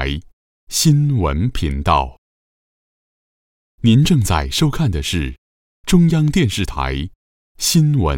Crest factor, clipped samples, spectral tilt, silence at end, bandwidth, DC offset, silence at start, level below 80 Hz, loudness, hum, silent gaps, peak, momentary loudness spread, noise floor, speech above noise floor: 14 dB; under 0.1%; -5 dB/octave; 0 s; 17 kHz; 0.2%; 0 s; -30 dBFS; -17 LUFS; none; 0.33-0.67 s, 2.18-3.78 s, 5.38-5.84 s, 7.15-7.55 s; -2 dBFS; 11 LU; under -90 dBFS; over 75 dB